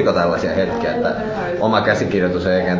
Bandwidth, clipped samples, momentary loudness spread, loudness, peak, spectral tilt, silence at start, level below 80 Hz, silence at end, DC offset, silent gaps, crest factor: 7.6 kHz; under 0.1%; 4 LU; -18 LUFS; -2 dBFS; -6.5 dB/octave; 0 s; -40 dBFS; 0 s; under 0.1%; none; 16 dB